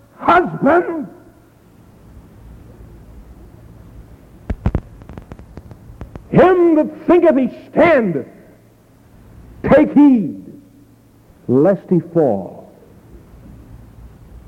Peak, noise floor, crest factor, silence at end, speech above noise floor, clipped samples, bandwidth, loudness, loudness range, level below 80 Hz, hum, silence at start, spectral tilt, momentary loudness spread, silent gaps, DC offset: -2 dBFS; -48 dBFS; 16 dB; 0.1 s; 35 dB; under 0.1%; 6.2 kHz; -14 LUFS; 16 LU; -38 dBFS; none; 0.2 s; -9 dB/octave; 26 LU; none; under 0.1%